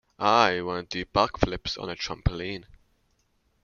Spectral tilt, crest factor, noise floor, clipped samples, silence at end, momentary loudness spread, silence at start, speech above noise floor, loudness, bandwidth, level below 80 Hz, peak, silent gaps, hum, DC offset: -5 dB/octave; 26 dB; -69 dBFS; under 0.1%; 1 s; 13 LU; 0.2 s; 43 dB; -26 LUFS; 7.2 kHz; -42 dBFS; -2 dBFS; none; none; under 0.1%